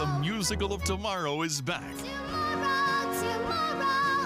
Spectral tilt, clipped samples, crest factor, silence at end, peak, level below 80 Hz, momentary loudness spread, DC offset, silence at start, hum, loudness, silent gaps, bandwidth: -4 dB/octave; under 0.1%; 16 dB; 0 s; -14 dBFS; -46 dBFS; 7 LU; under 0.1%; 0 s; none; -29 LUFS; none; 15.5 kHz